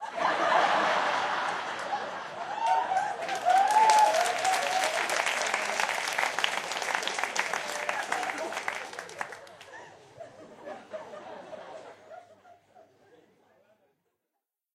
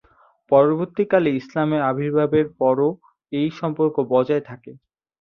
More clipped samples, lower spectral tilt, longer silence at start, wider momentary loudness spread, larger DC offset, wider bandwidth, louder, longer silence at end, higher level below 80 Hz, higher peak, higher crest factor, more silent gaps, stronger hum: neither; second, -0.5 dB/octave vs -9 dB/octave; second, 0 s vs 0.5 s; first, 22 LU vs 8 LU; neither; first, 15.5 kHz vs 6.4 kHz; second, -28 LUFS vs -20 LUFS; first, 2.2 s vs 0.5 s; second, -80 dBFS vs -62 dBFS; about the same, -6 dBFS vs -4 dBFS; first, 24 dB vs 18 dB; neither; neither